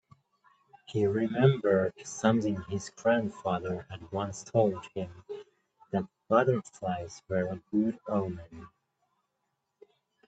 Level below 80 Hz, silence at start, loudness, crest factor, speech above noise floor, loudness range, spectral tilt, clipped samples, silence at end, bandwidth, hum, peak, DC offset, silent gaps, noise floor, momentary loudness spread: -66 dBFS; 0.9 s; -30 LUFS; 22 dB; 52 dB; 5 LU; -6.5 dB/octave; under 0.1%; 1.6 s; 9 kHz; none; -10 dBFS; under 0.1%; none; -81 dBFS; 14 LU